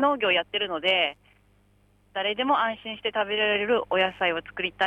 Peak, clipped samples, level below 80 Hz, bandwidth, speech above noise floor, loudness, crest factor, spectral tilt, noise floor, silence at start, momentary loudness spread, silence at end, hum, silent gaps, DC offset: -10 dBFS; under 0.1%; -62 dBFS; 9 kHz; 36 dB; -25 LUFS; 16 dB; -5 dB/octave; -62 dBFS; 0 s; 7 LU; 0 s; 50 Hz at -60 dBFS; none; under 0.1%